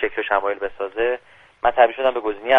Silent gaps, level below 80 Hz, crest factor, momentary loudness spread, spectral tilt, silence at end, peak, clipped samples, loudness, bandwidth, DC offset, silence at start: none; -50 dBFS; 20 dB; 10 LU; -5 dB/octave; 0 s; 0 dBFS; under 0.1%; -21 LUFS; 3.9 kHz; under 0.1%; 0 s